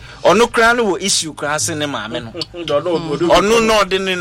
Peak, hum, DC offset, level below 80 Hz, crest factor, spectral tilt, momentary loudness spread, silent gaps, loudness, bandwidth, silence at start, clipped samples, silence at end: -2 dBFS; none; under 0.1%; -40 dBFS; 14 dB; -3 dB/octave; 12 LU; none; -15 LUFS; 16.5 kHz; 0 s; under 0.1%; 0 s